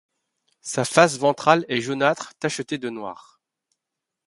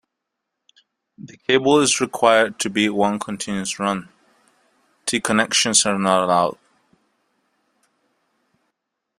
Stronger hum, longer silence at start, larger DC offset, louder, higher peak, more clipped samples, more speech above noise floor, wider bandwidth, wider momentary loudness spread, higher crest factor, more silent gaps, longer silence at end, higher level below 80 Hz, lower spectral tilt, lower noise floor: neither; second, 0.65 s vs 1.2 s; neither; about the same, -21 LUFS vs -19 LUFS; about the same, 0 dBFS vs 0 dBFS; neither; about the same, 63 dB vs 61 dB; second, 11.5 kHz vs 14.5 kHz; first, 15 LU vs 10 LU; about the same, 24 dB vs 22 dB; neither; second, 1.1 s vs 2.65 s; about the same, -66 dBFS vs -62 dBFS; first, -4 dB/octave vs -2.5 dB/octave; first, -84 dBFS vs -80 dBFS